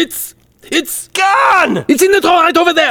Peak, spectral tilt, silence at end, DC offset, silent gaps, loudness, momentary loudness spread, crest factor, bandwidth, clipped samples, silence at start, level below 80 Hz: 0 dBFS; -2.5 dB/octave; 0 s; under 0.1%; none; -11 LUFS; 9 LU; 12 dB; over 20 kHz; under 0.1%; 0 s; -50 dBFS